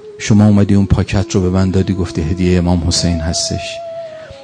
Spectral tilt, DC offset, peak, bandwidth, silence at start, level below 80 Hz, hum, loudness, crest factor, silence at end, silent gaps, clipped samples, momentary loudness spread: -5.5 dB/octave; under 0.1%; 0 dBFS; 9.8 kHz; 0 s; -28 dBFS; none; -14 LUFS; 14 dB; 0 s; none; 0.1%; 14 LU